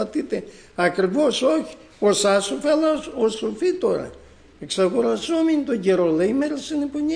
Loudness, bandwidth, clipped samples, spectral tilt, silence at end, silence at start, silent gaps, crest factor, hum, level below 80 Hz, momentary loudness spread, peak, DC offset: -21 LUFS; 10.5 kHz; under 0.1%; -4.5 dB/octave; 0 s; 0 s; none; 16 dB; none; -54 dBFS; 9 LU; -6 dBFS; under 0.1%